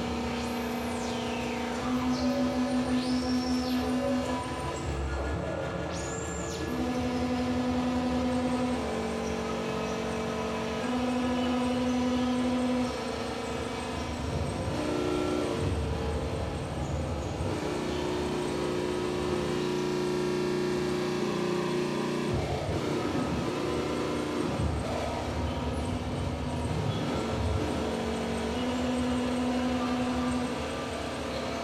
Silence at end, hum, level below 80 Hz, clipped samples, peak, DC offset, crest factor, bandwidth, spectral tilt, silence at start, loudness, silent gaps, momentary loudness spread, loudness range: 0 s; none; -42 dBFS; under 0.1%; -16 dBFS; under 0.1%; 14 dB; 14 kHz; -5.5 dB/octave; 0 s; -31 LUFS; none; 5 LU; 2 LU